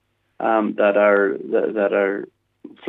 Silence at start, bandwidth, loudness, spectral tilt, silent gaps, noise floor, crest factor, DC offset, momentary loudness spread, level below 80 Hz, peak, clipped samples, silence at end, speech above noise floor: 0.4 s; 4 kHz; -19 LUFS; -8.5 dB/octave; none; -44 dBFS; 18 dB; under 0.1%; 10 LU; -78 dBFS; -2 dBFS; under 0.1%; 0 s; 26 dB